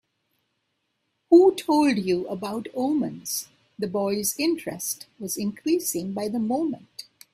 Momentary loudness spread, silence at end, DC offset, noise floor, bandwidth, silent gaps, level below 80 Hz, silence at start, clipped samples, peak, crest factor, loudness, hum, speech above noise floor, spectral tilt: 14 LU; 0.3 s; under 0.1%; -76 dBFS; 16 kHz; none; -68 dBFS; 1.3 s; under 0.1%; -6 dBFS; 20 dB; -24 LUFS; none; 52 dB; -4.5 dB/octave